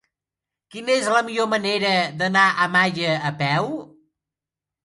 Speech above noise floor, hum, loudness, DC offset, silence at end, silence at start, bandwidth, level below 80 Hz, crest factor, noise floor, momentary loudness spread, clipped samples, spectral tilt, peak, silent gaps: 68 dB; none; -20 LUFS; under 0.1%; 0.95 s; 0.75 s; 11.5 kHz; -68 dBFS; 20 dB; -88 dBFS; 10 LU; under 0.1%; -4 dB/octave; -4 dBFS; none